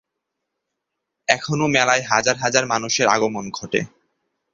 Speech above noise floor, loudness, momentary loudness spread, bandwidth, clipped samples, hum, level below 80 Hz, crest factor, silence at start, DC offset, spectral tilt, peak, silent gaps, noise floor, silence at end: 60 dB; -19 LUFS; 8 LU; 7.8 kHz; under 0.1%; none; -60 dBFS; 22 dB; 1.3 s; under 0.1%; -3 dB/octave; 0 dBFS; none; -80 dBFS; 0.65 s